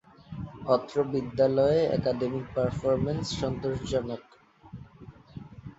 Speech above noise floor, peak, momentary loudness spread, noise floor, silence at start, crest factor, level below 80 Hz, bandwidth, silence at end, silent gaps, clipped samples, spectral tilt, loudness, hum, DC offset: 23 dB; -10 dBFS; 23 LU; -50 dBFS; 0.3 s; 20 dB; -50 dBFS; 8 kHz; 0.05 s; none; under 0.1%; -7 dB/octave; -28 LUFS; none; under 0.1%